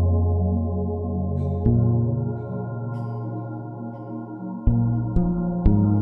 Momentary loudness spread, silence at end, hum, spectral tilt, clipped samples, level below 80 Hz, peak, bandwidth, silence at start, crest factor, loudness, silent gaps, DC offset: 13 LU; 0 s; none; -13.5 dB/octave; under 0.1%; -30 dBFS; -4 dBFS; 2.2 kHz; 0 s; 18 dB; -24 LUFS; none; under 0.1%